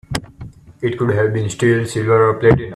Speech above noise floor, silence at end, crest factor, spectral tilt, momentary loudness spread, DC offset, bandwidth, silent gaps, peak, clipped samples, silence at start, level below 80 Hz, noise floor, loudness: 22 dB; 0 s; 16 dB; -6.5 dB/octave; 11 LU; under 0.1%; 13.5 kHz; none; 0 dBFS; under 0.1%; 0.1 s; -42 dBFS; -37 dBFS; -16 LUFS